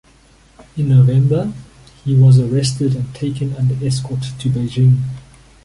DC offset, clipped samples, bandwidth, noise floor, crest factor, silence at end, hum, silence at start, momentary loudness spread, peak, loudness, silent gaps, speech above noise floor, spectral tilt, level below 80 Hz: under 0.1%; under 0.1%; 11.5 kHz; -48 dBFS; 14 dB; 0.45 s; none; 0.6 s; 15 LU; -2 dBFS; -16 LUFS; none; 34 dB; -7.5 dB/octave; -44 dBFS